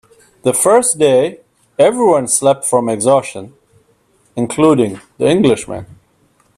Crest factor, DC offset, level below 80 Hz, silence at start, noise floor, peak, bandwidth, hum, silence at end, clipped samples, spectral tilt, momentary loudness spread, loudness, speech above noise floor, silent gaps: 14 dB; under 0.1%; -54 dBFS; 0.45 s; -56 dBFS; 0 dBFS; 14.5 kHz; none; 0.65 s; under 0.1%; -4.5 dB/octave; 17 LU; -13 LUFS; 43 dB; none